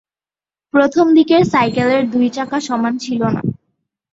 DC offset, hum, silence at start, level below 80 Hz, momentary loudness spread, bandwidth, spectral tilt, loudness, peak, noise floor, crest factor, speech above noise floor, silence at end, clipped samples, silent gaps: under 0.1%; none; 0.75 s; -52 dBFS; 8 LU; 7.8 kHz; -6 dB/octave; -15 LUFS; -2 dBFS; under -90 dBFS; 14 dB; over 76 dB; 0.6 s; under 0.1%; none